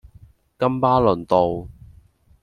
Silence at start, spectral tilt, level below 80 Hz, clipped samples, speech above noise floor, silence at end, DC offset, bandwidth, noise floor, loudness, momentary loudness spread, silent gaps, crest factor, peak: 0.6 s; -8.5 dB/octave; -46 dBFS; under 0.1%; 34 dB; 0.7 s; under 0.1%; 10.5 kHz; -52 dBFS; -19 LUFS; 7 LU; none; 18 dB; -4 dBFS